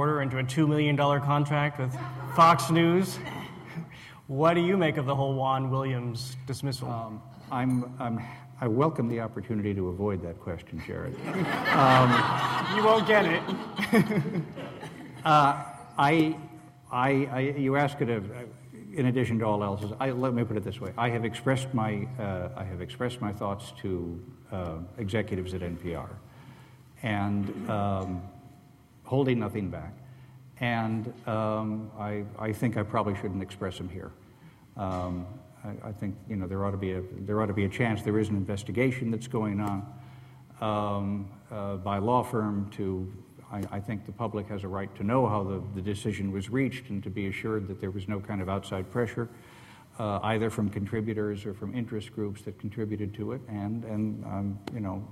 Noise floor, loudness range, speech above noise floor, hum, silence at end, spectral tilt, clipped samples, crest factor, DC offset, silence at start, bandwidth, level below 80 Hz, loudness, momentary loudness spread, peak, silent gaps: -55 dBFS; 9 LU; 27 dB; none; 0 s; -6.5 dB/octave; under 0.1%; 20 dB; under 0.1%; 0 s; 15 kHz; -58 dBFS; -29 LUFS; 15 LU; -8 dBFS; none